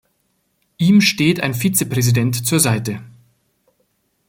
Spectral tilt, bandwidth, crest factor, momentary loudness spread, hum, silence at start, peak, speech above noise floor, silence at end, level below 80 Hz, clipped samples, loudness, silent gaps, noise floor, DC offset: -4.5 dB/octave; 17 kHz; 18 dB; 8 LU; none; 0.8 s; 0 dBFS; 51 dB; 1.2 s; -54 dBFS; under 0.1%; -16 LUFS; none; -66 dBFS; under 0.1%